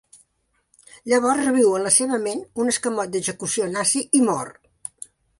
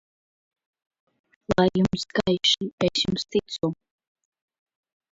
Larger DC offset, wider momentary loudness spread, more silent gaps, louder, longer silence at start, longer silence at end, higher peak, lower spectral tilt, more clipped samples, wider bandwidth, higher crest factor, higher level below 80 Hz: neither; first, 20 LU vs 8 LU; second, none vs 2.73-2.78 s; first, -20 LUFS vs -24 LUFS; second, 1.05 s vs 1.5 s; second, 0.9 s vs 1.4 s; about the same, -4 dBFS vs -6 dBFS; second, -3 dB/octave vs -4.5 dB/octave; neither; first, 11.5 kHz vs 7.8 kHz; about the same, 20 dB vs 20 dB; second, -64 dBFS vs -54 dBFS